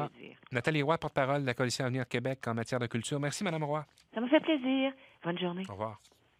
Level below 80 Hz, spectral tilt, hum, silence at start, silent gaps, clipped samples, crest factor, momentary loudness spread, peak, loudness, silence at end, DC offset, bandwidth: -70 dBFS; -5.5 dB/octave; none; 0 s; none; under 0.1%; 22 dB; 10 LU; -12 dBFS; -33 LUFS; 0.45 s; under 0.1%; 15 kHz